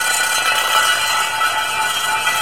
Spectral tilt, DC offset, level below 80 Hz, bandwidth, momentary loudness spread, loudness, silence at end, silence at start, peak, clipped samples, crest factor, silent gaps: 1.5 dB/octave; 0.8%; -56 dBFS; 17 kHz; 3 LU; -15 LUFS; 0 s; 0 s; 0 dBFS; under 0.1%; 16 dB; none